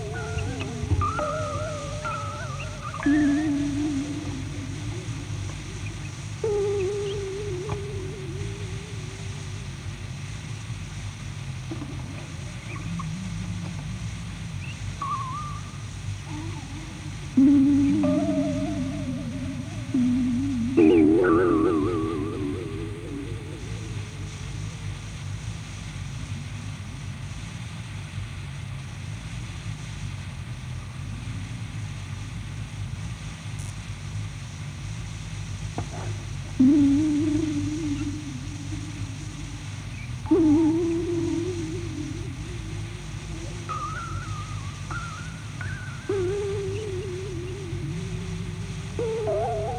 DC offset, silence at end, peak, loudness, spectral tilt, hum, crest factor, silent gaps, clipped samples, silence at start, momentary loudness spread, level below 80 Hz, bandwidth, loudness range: under 0.1%; 0 s; -6 dBFS; -28 LUFS; -6.5 dB/octave; none; 20 dB; none; under 0.1%; 0 s; 14 LU; -42 dBFS; 11 kHz; 12 LU